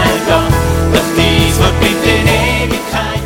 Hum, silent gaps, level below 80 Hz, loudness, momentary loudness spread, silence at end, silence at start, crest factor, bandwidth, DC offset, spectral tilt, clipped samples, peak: none; none; -20 dBFS; -11 LUFS; 5 LU; 0 s; 0 s; 12 dB; 17 kHz; under 0.1%; -5 dB/octave; under 0.1%; 0 dBFS